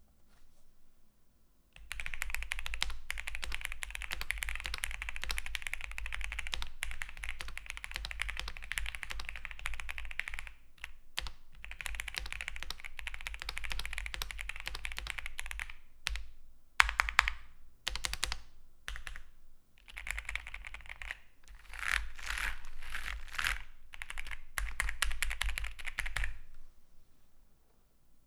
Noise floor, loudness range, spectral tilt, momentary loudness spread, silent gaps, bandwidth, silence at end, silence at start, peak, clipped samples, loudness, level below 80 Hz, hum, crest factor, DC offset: -64 dBFS; 8 LU; -0.5 dB/octave; 12 LU; none; 16.5 kHz; 0.05 s; 0 s; 0 dBFS; under 0.1%; -39 LUFS; -44 dBFS; none; 38 dB; under 0.1%